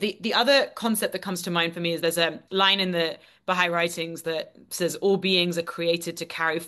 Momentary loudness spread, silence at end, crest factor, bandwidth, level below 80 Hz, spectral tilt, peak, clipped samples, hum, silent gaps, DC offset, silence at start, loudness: 10 LU; 0 s; 18 dB; 13 kHz; -72 dBFS; -3.5 dB/octave; -6 dBFS; under 0.1%; none; none; under 0.1%; 0 s; -24 LUFS